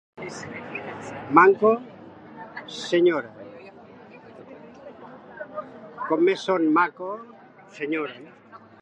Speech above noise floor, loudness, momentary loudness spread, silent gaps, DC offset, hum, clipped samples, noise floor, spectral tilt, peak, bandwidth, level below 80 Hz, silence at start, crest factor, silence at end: 24 dB; -23 LUFS; 25 LU; none; under 0.1%; none; under 0.1%; -46 dBFS; -5.5 dB/octave; -2 dBFS; 9 kHz; -70 dBFS; 0.2 s; 24 dB; 0.25 s